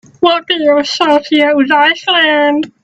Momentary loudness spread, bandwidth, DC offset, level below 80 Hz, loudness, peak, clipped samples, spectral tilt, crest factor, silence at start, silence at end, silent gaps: 3 LU; 8.4 kHz; under 0.1%; -60 dBFS; -10 LUFS; 0 dBFS; under 0.1%; -3 dB/octave; 10 dB; 0.2 s; 0.15 s; none